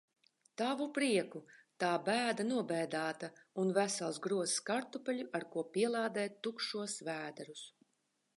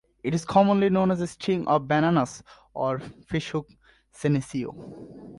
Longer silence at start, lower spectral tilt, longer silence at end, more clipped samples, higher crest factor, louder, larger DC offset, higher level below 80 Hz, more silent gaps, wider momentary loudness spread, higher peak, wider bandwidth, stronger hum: first, 0.6 s vs 0.25 s; second, -3.5 dB/octave vs -6.5 dB/octave; first, 0.7 s vs 0.05 s; neither; about the same, 18 dB vs 18 dB; second, -37 LUFS vs -25 LUFS; neither; second, -90 dBFS vs -56 dBFS; neither; second, 13 LU vs 18 LU; second, -18 dBFS vs -6 dBFS; about the same, 11.5 kHz vs 11.5 kHz; neither